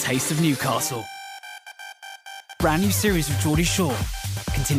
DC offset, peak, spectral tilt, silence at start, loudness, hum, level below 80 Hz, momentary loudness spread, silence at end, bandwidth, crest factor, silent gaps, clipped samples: under 0.1%; -8 dBFS; -4.5 dB/octave; 0 s; -23 LUFS; none; -36 dBFS; 18 LU; 0 s; 16.5 kHz; 16 dB; none; under 0.1%